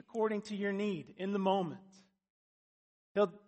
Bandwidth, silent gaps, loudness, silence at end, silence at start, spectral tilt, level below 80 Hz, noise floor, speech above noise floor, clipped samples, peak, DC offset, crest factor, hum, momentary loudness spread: 8.4 kHz; 2.30-3.15 s; -36 LUFS; 0.1 s; 0.15 s; -6.5 dB/octave; -82 dBFS; under -90 dBFS; over 55 dB; under 0.1%; -18 dBFS; under 0.1%; 18 dB; none; 8 LU